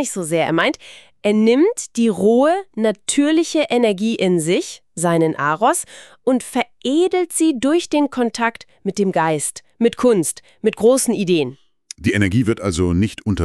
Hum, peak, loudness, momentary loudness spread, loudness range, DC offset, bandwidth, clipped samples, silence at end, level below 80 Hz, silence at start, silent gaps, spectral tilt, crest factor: none; -2 dBFS; -18 LUFS; 8 LU; 2 LU; 0.2%; 13.5 kHz; under 0.1%; 0 s; -46 dBFS; 0 s; none; -5 dB/octave; 14 dB